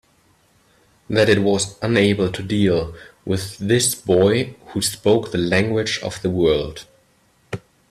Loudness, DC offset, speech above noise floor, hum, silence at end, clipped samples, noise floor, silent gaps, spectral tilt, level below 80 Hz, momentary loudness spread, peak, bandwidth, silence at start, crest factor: -19 LUFS; under 0.1%; 40 dB; none; 0.35 s; under 0.1%; -59 dBFS; none; -4.5 dB/octave; -48 dBFS; 16 LU; -2 dBFS; 15 kHz; 1.1 s; 18 dB